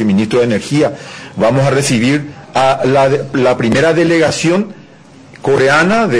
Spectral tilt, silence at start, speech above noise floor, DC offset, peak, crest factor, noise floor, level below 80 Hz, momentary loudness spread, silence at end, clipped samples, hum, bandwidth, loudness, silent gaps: -5.5 dB/octave; 0 s; 27 dB; under 0.1%; -2 dBFS; 10 dB; -39 dBFS; -46 dBFS; 8 LU; 0 s; under 0.1%; none; 11 kHz; -12 LUFS; none